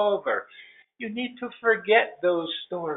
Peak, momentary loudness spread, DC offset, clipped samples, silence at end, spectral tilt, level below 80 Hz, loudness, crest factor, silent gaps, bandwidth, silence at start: -6 dBFS; 14 LU; under 0.1%; under 0.1%; 0 s; -1.5 dB/octave; -76 dBFS; -25 LUFS; 20 dB; none; 4.1 kHz; 0 s